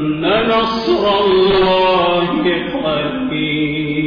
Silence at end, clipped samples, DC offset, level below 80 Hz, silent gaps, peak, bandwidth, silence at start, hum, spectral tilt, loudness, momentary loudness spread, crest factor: 0 s; under 0.1%; under 0.1%; -40 dBFS; none; -4 dBFS; 5.2 kHz; 0 s; none; -7 dB/octave; -15 LUFS; 6 LU; 10 dB